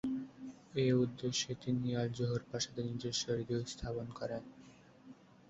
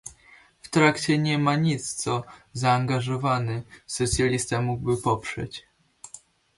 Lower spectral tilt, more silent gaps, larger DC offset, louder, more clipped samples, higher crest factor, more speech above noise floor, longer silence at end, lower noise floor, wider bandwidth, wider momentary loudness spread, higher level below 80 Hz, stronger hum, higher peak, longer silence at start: about the same, -6 dB/octave vs -5 dB/octave; neither; neither; second, -38 LUFS vs -25 LUFS; neither; about the same, 18 dB vs 20 dB; second, 23 dB vs 30 dB; about the same, 0.35 s vs 0.4 s; first, -59 dBFS vs -55 dBFS; second, 8 kHz vs 11.5 kHz; second, 10 LU vs 17 LU; second, -62 dBFS vs -48 dBFS; neither; second, -20 dBFS vs -6 dBFS; about the same, 0.05 s vs 0.05 s